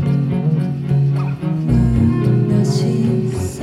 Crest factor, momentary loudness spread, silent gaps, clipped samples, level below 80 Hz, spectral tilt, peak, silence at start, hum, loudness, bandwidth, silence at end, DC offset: 12 dB; 5 LU; none; under 0.1%; -32 dBFS; -8.5 dB/octave; -2 dBFS; 0 s; none; -17 LUFS; 12 kHz; 0 s; under 0.1%